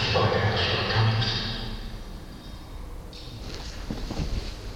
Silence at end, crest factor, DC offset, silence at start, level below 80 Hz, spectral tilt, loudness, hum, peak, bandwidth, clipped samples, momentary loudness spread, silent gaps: 0 s; 18 dB; under 0.1%; 0 s; -38 dBFS; -5.5 dB/octave; -27 LUFS; none; -10 dBFS; 14 kHz; under 0.1%; 19 LU; none